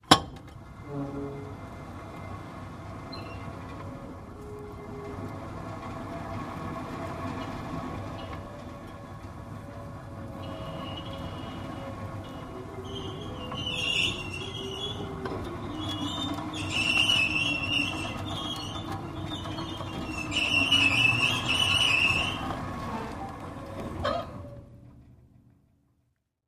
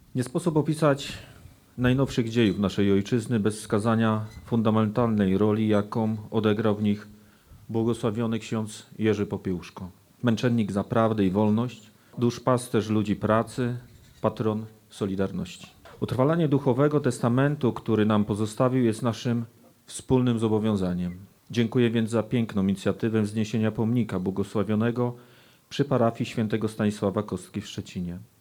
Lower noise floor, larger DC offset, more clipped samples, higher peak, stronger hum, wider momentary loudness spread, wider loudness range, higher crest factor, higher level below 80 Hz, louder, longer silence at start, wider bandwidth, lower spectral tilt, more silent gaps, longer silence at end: first, -74 dBFS vs -52 dBFS; neither; neither; first, -2 dBFS vs -8 dBFS; neither; first, 20 LU vs 11 LU; first, 16 LU vs 4 LU; first, 30 dB vs 18 dB; first, -50 dBFS vs -58 dBFS; second, -29 LUFS vs -26 LUFS; about the same, 0.05 s vs 0.15 s; about the same, 15.5 kHz vs 16 kHz; second, -3.5 dB/octave vs -7 dB/octave; neither; first, 1.2 s vs 0.15 s